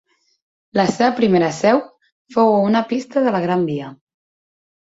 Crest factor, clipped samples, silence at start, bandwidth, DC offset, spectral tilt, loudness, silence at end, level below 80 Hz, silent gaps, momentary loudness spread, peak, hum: 18 dB; under 0.1%; 0.75 s; 8 kHz; under 0.1%; -6 dB/octave; -18 LUFS; 0.9 s; -60 dBFS; 2.12-2.25 s; 9 LU; -2 dBFS; none